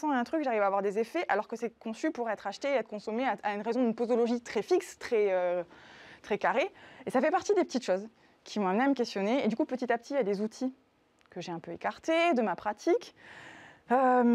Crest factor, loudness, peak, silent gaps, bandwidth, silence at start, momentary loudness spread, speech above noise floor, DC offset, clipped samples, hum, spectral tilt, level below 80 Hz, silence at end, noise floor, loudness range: 16 dB; -31 LUFS; -14 dBFS; none; 13 kHz; 0 s; 12 LU; 36 dB; under 0.1%; under 0.1%; none; -5 dB/octave; -76 dBFS; 0 s; -66 dBFS; 2 LU